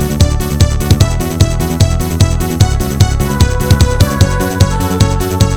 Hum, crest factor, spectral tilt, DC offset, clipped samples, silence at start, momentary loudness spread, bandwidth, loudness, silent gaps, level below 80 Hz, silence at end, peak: none; 10 dB; -5.5 dB/octave; under 0.1%; 0.9%; 0 s; 2 LU; 18 kHz; -12 LUFS; none; -16 dBFS; 0 s; 0 dBFS